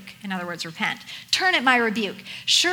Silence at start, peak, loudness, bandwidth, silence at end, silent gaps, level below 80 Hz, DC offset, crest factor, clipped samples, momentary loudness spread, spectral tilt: 0 s; -4 dBFS; -22 LUFS; over 20 kHz; 0 s; none; -68 dBFS; under 0.1%; 20 dB; under 0.1%; 13 LU; -1.5 dB/octave